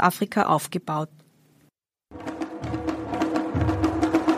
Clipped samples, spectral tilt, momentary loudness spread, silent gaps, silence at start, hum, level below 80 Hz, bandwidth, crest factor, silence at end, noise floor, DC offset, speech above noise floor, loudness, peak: under 0.1%; -6 dB/octave; 14 LU; none; 0 s; none; -44 dBFS; 15.5 kHz; 20 dB; 0 s; -65 dBFS; under 0.1%; 42 dB; -26 LUFS; -4 dBFS